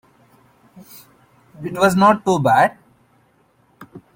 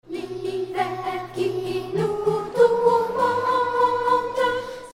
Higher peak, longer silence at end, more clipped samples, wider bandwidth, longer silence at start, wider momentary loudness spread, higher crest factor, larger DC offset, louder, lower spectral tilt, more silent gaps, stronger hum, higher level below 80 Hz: first, -2 dBFS vs -6 dBFS; about the same, 0.15 s vs 0.05 s; neither; first, 17 kHz vs 15 kHz; first, 1.6 s vs 0.05 s; first, 13 LU vs 10 LU; about the same, 18 dB vs 16 dB; neither; first, -16 LUFS vs -23 LUFS; about the same, -6 dB/octave vs -5.5 dB/octave; neither; neither; about the same, -58 dBFS vs -56 dBFS